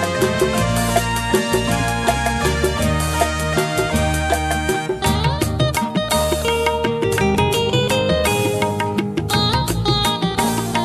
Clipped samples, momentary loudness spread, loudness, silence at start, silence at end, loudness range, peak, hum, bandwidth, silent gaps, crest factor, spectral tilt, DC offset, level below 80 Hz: under 0.1%; 3 LU; -18 LUFS; 0 s; 0 s; 1 LU; -2 dBFS; none; 15 kHz; none; 16 dB; -4.5 dB/octave; under 0.1%; -30 dBFS